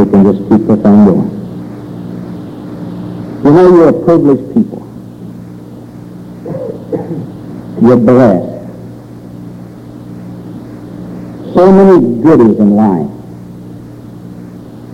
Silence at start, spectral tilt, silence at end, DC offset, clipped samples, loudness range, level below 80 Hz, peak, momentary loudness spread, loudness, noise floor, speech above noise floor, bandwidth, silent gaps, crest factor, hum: 0 s; -10 dB/octave; 0 s; under 0.1%; under 0.1%; 8 LU; -42 dBFS; 0 dBFS; 24 LU; -8 LUFS; -28 dBFS; 23 dB; 7.2 kHz; none; 10 dB; none